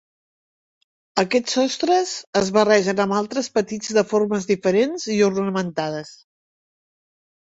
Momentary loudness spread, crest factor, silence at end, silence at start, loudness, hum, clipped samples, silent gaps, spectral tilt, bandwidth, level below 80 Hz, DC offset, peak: 8 LU; 20 dB; 1.4 s; 1.15 s; -20 LUFS; none; under 0.1%; 2.27-2.33 s; -4.5 dB/octave; 8 kHz; -62 dBFS; under 0.1%; -2 dBFS